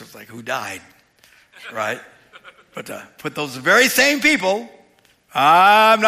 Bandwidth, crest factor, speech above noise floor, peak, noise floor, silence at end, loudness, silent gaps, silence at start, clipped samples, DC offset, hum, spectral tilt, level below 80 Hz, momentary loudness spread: 15.5 kHz; 16 dB; 39 dB; -4 dBFS; -56 dBFS; 0 s; -16 LUFS; none; 0 s; under 0.1%; under 0.1%; none; -2.5 dB/octave; -64 dBFS; 23 LU